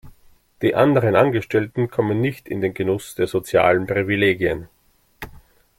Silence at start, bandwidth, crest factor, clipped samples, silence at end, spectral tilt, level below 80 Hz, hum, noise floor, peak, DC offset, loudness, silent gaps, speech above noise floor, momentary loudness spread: 0.05 s; 16.5 kHz; 18 dB; under 0.1%; 0.4 s; -7 dB/octave; -50 dBFS; none; -52 dBFS; -2 dBFS; under 0.1%; -20 LUFS; none; 33 dB; 11 LU